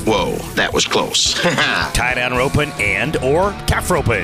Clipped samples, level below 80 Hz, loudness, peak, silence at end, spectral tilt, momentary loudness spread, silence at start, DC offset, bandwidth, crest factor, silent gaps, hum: under 0.1%; -32 dBFS; -16 LUFS; -6 dBFS; 0 s; -3.5 dB/octave; 3 LU; 0 s; under 0.1%; 16 kHz; 12 dB; none; none